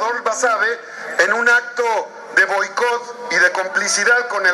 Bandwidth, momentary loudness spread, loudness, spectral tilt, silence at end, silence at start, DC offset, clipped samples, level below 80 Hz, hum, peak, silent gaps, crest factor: 13 kHz; 6 LU; -16 LUFS; 0 dB/octave; 0 s; 0 s; under 0.1%; under 0.1%; -86 dBFS; none; 0 dBFS; none; 18 dB